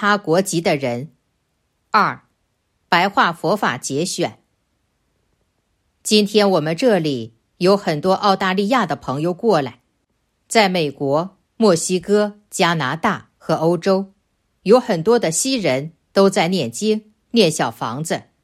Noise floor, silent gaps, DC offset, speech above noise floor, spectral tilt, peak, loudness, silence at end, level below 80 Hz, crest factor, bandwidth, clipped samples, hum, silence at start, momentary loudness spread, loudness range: -69 dBFS; none; under 0.1%; 51 dB; -4.5 dB/octave; 0 dBFS; -18 LUFS; 0.25 s; -62 dBFS; 18 dB; 15.5 kHz; under 0.1%; none; 0 s; 9 LU; 3 LU